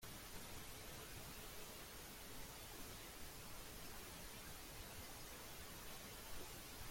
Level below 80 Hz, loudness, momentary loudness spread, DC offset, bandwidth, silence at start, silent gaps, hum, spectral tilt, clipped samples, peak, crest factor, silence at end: -62 dBFS; -54 LUFS; 1 LU; under 0.1%; 16.5 kHz; 0 s; none; none; -2.5 dB/octave; under 0.1%; -38 dBFS; 14 dB; 0 s